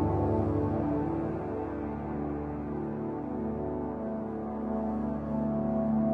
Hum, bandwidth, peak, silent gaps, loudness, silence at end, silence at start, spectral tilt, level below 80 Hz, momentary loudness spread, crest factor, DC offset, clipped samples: none; 4.3 kHz; -16 dBFS; none; -32 LUFS; 0 s; 0 s; -11.5 dB/octave; -48 dBFS; 7 LU; 14 dB; under 0.1%; under 0.1%